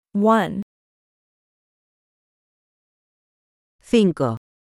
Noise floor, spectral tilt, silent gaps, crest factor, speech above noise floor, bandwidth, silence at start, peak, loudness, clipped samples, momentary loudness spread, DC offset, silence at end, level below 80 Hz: under -90 dBFS; -7 dB/octave; 0.62-3.79 s; 20 dB; over 72 dB; 13 kHz; 0.15 s; -4 dBFS; -20 LUFS; under 0.1%; 13 LU; under 0.1%; 0.25 s; -60 dBFS